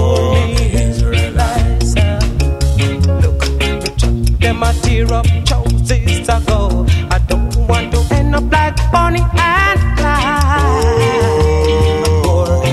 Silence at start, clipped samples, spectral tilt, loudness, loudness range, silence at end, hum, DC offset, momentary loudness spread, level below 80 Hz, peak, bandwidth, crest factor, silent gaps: 0 s; under 0.1%; -5.5 dB/octave; -13 LUFS; 2 LU; 0 s; none; under 0.1%; 3 LU; -16 dBFS; -2 dBFS; 13.5 kHz; 10 dB; none